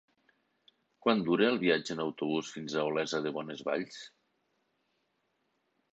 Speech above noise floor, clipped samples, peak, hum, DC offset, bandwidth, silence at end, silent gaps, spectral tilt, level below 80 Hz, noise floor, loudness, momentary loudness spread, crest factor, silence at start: 47 dB; under 0.1%; -12 dBFS; none; under 0.1%; 8.2 kHz; 1.85 s; none; -5 dB/octave; -76 dBFS; -78 dBFS; -32 LUFS; 10 LU; 22 dB; 1.05 s